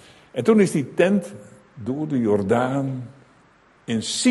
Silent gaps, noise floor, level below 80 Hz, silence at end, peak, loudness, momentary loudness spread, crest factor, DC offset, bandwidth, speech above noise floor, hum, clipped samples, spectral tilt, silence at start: none; -55 dBFS; -58 dBFS; 0 s; -4 dBFS; -22 LUFS; 16 LU; 18 dB; under 0.1%; 12 kHz; 35 dB; none; under 0.1%; -5.5 dB/octave; 0.35 s